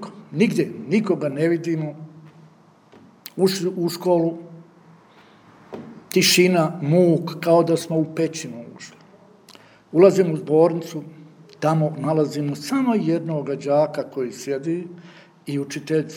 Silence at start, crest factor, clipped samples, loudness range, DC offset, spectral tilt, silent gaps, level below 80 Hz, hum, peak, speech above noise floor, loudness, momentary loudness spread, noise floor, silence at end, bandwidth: 0 s; 20 dB; under 0.1%; 6 LU; under 0.1%; -5.5 dB/octave; none; -74 dBFS; none; -2 dBFS; 31 dB; -21 LUFS; 21 LU; -52 dBFS; 0 s; over 20 kHz